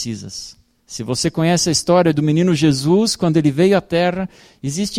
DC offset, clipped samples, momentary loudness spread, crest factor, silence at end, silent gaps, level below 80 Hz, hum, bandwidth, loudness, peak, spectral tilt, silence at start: under 0.1%; under 0.1%; 15 LU; 14 dB; 0 s; none; -48 dBFS; none; 15.5 kHz; -16 LUFS; -2 dBFS; -5 dB/octave; 0 s